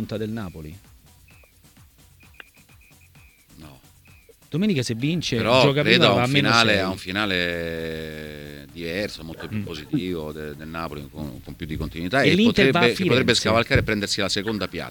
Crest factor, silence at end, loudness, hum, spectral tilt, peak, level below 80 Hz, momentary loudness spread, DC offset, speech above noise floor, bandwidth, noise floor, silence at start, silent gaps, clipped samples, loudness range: 24 dB; 0 s; -21 LUFS; none; -5 dB/octave; 0 dBFS; -46 dBFS; 18 LU; under 0.1%; 30 dB; 19 kHz; -53 dBFS; 0 s; none; under 0.1%; 12 LU